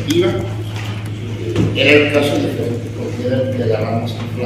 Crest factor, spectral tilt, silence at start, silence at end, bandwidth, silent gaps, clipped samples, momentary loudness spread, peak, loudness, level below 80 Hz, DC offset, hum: 16 dB; -6 dB/octave; 0 s; 0 s; 15 kHz; none; under 0.1%; 13 LU; 0 dBFS; -17 LUFS; -42 dBFS; under 0.1%; none